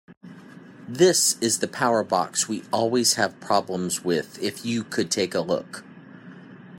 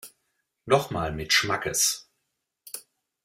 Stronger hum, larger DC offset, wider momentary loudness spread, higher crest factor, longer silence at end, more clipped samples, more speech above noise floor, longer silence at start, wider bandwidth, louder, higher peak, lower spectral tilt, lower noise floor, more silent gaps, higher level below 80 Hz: neither; neither; second, 10 LU vs 18 LU; about the same, 20 dB vs 24 dB; second, 0 s vs 0.45 s; neither; second, 21 dB vs 55 dB; about the same, 0.1 s vs 0.05 s; about the same, 16.5 kHz vs 16.5 kHz; about the same, -23 LUFS vs -24 LUFS; about the same, -6 dBFS vs -4 dBFS; about the same, -3 dB/octave vs -2 dB/octave; second, -45 dBFS vs -80 dBFS; first, 0.17-0.21 s vs none; second, -70 dBFS vs -54 dBFS